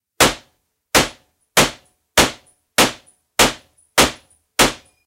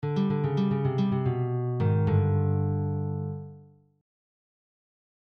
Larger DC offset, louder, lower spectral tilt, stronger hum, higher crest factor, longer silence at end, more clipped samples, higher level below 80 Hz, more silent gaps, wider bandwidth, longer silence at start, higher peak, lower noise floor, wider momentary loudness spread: neither; first, -17 LUFS vs -27 LUFS; second, -2 dB/octave vs -10.5 dB/octave; second, none vs 50 Hz at -50 dBFS; first, 20 dB vs 14 dB; second, 0.3 s vs 1.65 s; neither; first, -40 dBFS vs -60 dBFS; neither; first, 17 kHz vs 5.6 kHz; first, 0.2 s vs 0 s; first, 0 dBFS vs -14 dBFS; first, -64 dBFS vs -52 dBFS; about the same, 9 LU vs 9 LU